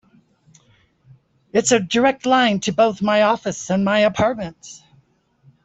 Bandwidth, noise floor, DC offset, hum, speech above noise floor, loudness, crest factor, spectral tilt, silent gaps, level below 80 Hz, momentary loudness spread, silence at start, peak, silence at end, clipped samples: 8.4 kHz; -59 dBFS; under 0.1%; none; 41 dB; -18 LUFS; 18 dB; -4 dB/octave; none; -56 dBFS; 11 LU; 1.55 s; -4 dBFS; 0.9 s; under 0.1%